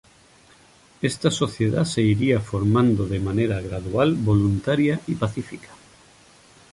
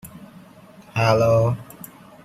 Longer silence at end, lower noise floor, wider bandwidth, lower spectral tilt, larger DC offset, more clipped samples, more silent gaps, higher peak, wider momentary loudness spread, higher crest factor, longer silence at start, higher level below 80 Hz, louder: first, 1 s vs 0.6 s; first, -53 dBFS vs -46 dBFS; second, 11.5 kHz vs 15.5 kHz; about the same, -6.5 dB/octave vs -6.5 dB/octave; neither; neither; neither; about the same, -4 dBFS vs -4 dBFS; second, 8 LU vs 24 LU; about the same, 18 dB vs 20 dB; first, 1 s vs 0.05 s; first, -44 dBFS vs -52 dBFS; about the same, -22 LUFS vs -20 LUFS